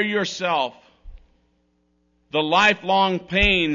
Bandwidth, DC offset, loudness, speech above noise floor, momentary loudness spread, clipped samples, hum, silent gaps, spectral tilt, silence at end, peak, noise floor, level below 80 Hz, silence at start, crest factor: 7.4 kHz; under 0.1%; -20 LUFS; 46 dB; 8 LU; under 0.1%; none; none; -4 dB/octave; 0 s; -4 dBFS; -66 dBFS; -40 dBFS; 0 s; 18 dB